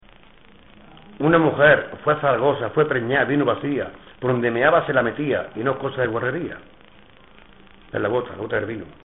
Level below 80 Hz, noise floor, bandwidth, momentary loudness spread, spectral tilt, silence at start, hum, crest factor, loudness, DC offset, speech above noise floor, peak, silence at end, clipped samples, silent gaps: -54 dBFS; -50 dBFS; 4 kHz; 12 LU; -4.5 dB/octave; 1.1 s; none; 18 dB; -21 LUFS; 0.2%; 30 dB; -4 dBFS; 0.15 s; under 0.1%; none